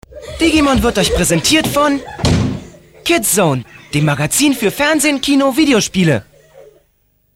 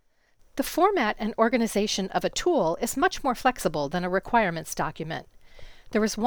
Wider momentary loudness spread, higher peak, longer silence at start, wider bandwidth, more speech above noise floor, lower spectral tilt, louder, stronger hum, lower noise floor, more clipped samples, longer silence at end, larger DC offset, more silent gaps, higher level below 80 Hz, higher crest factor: about the same, 8 LU vs 8 LU; first, -2 dBFS vs -8 dBFS; second, 0.1 s vs 0.55 s; second, 16.5 kHz vs over 20 kHz; first, 46 dB vs 36 dB; about the same, -4 dB/octave vs -4 dB/octave; first, -13 LUFS vs -26 LUFS; neither; about the same, -59 dBFS vs -61 dBFS; neither; first, 0.75 s vs 0 s; second, under 0.1% vs 0.1%; neither; first, -32 dBFS vs -48 dBFS; about the same, 14 dB vs 18 dB